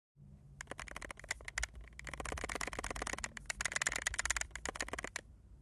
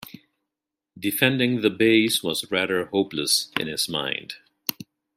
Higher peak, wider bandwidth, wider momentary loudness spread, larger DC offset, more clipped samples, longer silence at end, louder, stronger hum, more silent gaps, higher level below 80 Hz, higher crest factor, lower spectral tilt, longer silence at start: second, -16 dBFS vs -2 dBFS; second, 12.5 kHz vs 16 kHz; about the same, 13 LU vs 12 LU; neither; neither; second, 0 s vs 0.35 s; second, -41 LUFS vs -23 LUFS; neither; neither; first, -52 dBFS vs -66 dBFS; first, 28 dB vs 22 dB; second, -1.5 dB/octave vs -3.5 dB/octave; about the same, 0.15 s vs 0.05 s